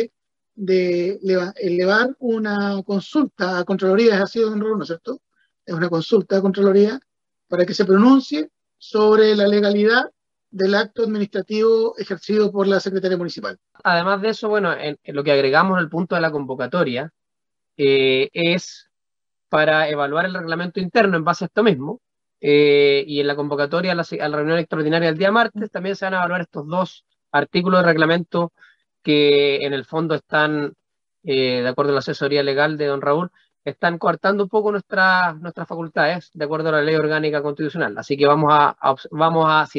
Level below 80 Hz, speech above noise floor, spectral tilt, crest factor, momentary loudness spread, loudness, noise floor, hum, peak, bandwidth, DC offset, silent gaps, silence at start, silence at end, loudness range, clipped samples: -68 dBFS; 71 dB; -6.5 dB/octave; 18 dB; 11 LU; -19 LUFS; -89 dBFS; none; 0 dBFS; 7.4 kHz; under 0.1%; none; 0 s; 0 s; 3 LU; under 0.1%